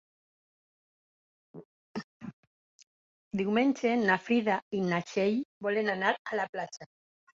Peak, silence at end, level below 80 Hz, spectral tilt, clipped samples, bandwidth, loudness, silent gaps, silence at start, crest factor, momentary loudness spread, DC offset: -12 dBFS; 0.5 s; -74 dBFS; -6 dB/octave; under 0.1%; 7.6 kHz; -30 LUFS; 1.65-1.94 s, 2.04-2.20 s, 2.33-3.31 s, 4.62-4.71 s, 5.45-5.61 s, 6.19-6.25 s, 6.49-6.53 s; 1.55 s; 20 dB; 16 LU; under 0.1%